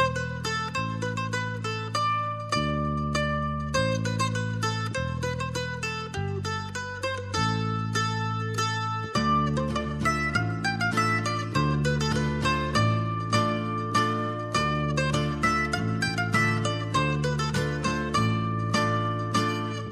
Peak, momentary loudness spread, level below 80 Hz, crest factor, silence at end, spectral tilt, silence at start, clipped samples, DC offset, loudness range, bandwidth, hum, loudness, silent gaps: -10 dBFS; 6 LU; -44 dBFS; 16 dB; 0 s; -5 dB/octave; 0 s; under 0.1%; under 0.1%; 4 LU; 13 kHz; none; -27 LUFS; none